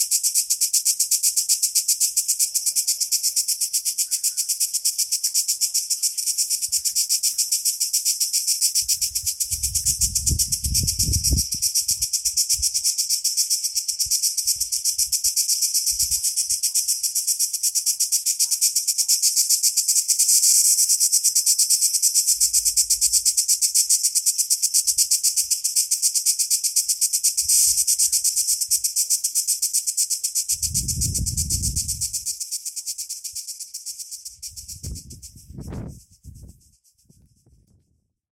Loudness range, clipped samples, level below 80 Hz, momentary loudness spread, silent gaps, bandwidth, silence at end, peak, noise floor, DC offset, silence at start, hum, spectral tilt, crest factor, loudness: 9 LU; under 0.1%; -40 dBFS; 8 LU; none; 16.5 kHz; 1.85 s; -2 dBFS; -68 dBFS; under 0.1%; 0 s; none; 0.5 dB/octave; 20 dB; -18 LUFS